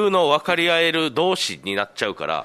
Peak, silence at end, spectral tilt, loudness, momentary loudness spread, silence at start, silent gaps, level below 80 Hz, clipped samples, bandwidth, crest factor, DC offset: -2 dBFS; 0 s; -3.5 dB/octave; -20 LUFS; 8 LU; 0 s; none; -64 dBFS; under 0.1%; 13.5 kHz; 18 dB; under 0.1%